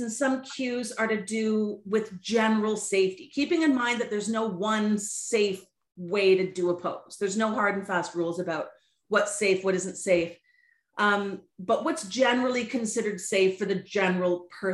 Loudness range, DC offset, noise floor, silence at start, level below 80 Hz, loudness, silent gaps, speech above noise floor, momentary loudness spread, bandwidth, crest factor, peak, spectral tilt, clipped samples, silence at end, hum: 2 LU; under 0.1%; -66 dBFS; 0 s; -72 dBFS; -27 LUFS; none; 39 dB; 7 LU; 12.5 kHz; 18 dB; -10 dBFS; -4 dB/octave; under 0.1%; 0 s; none